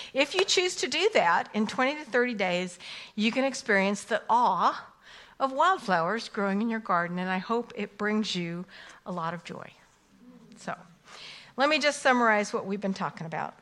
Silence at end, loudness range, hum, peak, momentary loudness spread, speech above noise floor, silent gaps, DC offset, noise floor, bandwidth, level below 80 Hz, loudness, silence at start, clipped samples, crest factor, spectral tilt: 0.1 s; 8 LU; none; -8 dBFS; 16 LU; 29 dB; none; under 0.1%; -57 dBFS; 12.5 kHz; -72 dBFS; -27 LUFS; 0 s; under 0.1%; 20 dB; -4 dB/octave